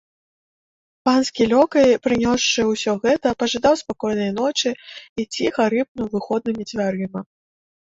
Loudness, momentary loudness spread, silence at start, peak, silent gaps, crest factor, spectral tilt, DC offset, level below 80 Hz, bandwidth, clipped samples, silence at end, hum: -20 LUFS; 11 LU; 1.05 s; -4 dBFS; 5.09-5.16 s, 5.88-5.95 s; 16 dB; -4 dB/octave; under 0.1%; -52 dBFS; 8 kHz; under 0.1%; 0.7 s; none